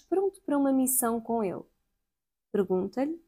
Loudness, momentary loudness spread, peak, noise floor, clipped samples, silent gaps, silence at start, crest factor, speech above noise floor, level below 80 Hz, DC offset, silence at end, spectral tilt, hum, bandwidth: -28 LUFS; 9 LU; -12 dBFS; -89 dBFS; under 0.1%; none; 0.1 s; 18 dB; 61 dB; -68 dBFS; under 0.1%; 0.1 s; -5.5 dB/octave; none; 16.5 kHz